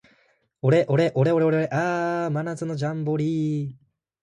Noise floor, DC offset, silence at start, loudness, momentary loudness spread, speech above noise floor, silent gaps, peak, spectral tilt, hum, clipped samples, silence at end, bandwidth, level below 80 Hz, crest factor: -64 dBFS; under 0.1%; 0.65 s; -23 LUFS; 8 LU; 42 dB; none; -8 dBFS; -8 dB/octave; none; under 0.1%; 0.45 s; 11 kHz; -66 dBFS; 16 dB